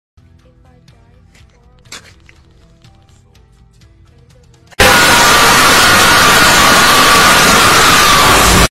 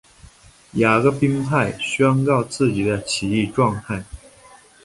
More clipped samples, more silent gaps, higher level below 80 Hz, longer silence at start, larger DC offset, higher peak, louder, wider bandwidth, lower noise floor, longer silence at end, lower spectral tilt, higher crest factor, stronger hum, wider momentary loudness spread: first, 0.4% vs under 0.1%; neither; first, -28 dBFS vs -48 dBFS; first, 1.9 s vs 0.75 s; neither; about the same, 0 dBFS vs -2 dBFS; first, -5 LUFS vs -20 LUFS; first, over 20 kHz vs 11.5 kHz; second, -44 dBFS vs -48 dBFS; second, 0 s vs 0.65 s; second, -2 dB/octave vs -6 dB/octave; second, 10 dB vs 18 dB; neither; second, 1 LU vs 12 LU